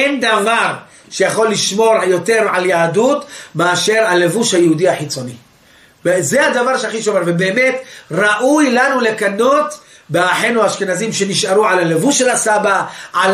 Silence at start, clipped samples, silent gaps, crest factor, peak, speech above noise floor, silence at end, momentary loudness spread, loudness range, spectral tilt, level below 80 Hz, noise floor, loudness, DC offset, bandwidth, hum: 0 s; under 0.1%; none; 12 dB; -2 dBFS; 33 dB; 0 s; 8 LU; 2 LU; -3.5 dB/octave; -62 dBFS; -47 dBFS; -14 LUFS; under 0.1%; 15 kHz; none